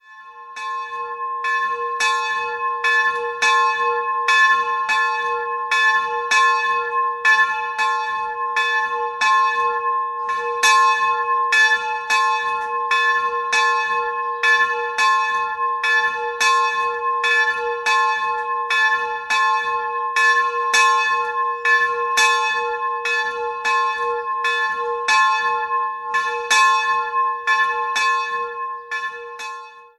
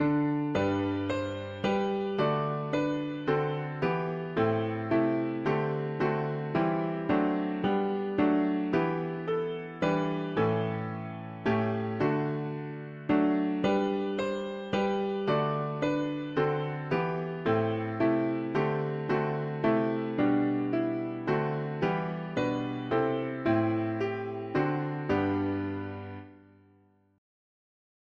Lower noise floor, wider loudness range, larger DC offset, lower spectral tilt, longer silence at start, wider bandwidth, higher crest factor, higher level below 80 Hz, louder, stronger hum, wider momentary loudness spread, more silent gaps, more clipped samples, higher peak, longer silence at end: second, -40 dBFS vs -64 dBFS; about the same, 2 LU vs 2 LU; neither; second, 2 dB/octave vs -8 dB/octave; about the same, 0.1 s vs 0 s; first, 12.5 kHz vs 7.4 kHz; about the same, 18 dB vs 16 dB; about the same, -64 dBFS vs -62 dBFS; first, -18 LUFS vs -30 LUFS; neither; first, 8 LU vs 5 LU; neither; neither; first, -2 dBFS vs -14 dBFS; second, 0.15 s vs 1.85 s